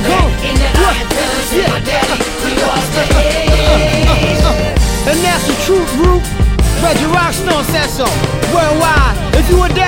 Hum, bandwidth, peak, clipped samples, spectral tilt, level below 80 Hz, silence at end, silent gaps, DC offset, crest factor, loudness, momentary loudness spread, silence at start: none; 17 kHz; 0 dBFS; under 0.1%; -4.5 dB/octave; -16 dBFS; 0 s; none; under 0.1%; 10 dB; -12 LUFS; 3 LU; 0 s